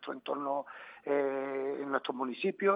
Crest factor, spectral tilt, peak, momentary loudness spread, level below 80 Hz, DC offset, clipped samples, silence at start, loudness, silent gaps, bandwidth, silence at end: 20 dB; -8.5 dB/octave; -14 dBFS; 6 LU; -88 dBFS; under 0.1%; under 0.1%; 0 s; -35 LUFS; none; 5 kHz; 0 s